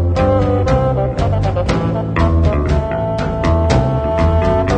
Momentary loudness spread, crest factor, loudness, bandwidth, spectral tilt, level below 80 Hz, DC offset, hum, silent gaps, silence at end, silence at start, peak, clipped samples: 4 LU; 14 dB; -15 LUFS; 8.8 kHz; -8 dB/octave; -22 dBFS; under 0.1%; none; none; 0 s; 0 s; 0 dBFS; under 0.1%